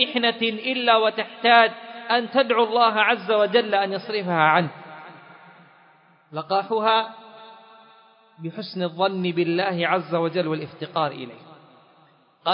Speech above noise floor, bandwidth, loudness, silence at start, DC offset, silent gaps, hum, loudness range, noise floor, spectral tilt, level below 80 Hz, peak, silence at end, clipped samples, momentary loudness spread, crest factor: 36 dB; 5.4 kHz; -21 LUFS; 0 s; under 0.1%; none; none; 8 LU; -57 dBFS; -9.5 dB/octave; -78 dBFS; -2 dBFS; 0 s; under 0.1%; 17 LU; 22 dB